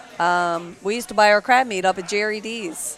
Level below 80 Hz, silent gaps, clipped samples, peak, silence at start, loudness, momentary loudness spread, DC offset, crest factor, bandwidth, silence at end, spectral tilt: -62 dBFS; none; under 0.1%; -2 dBFS; 0.05 s; -20 LUFS; 11 LU; under 0.1%; 18 dB; 15 kHz; 0 s; -3 dB/octave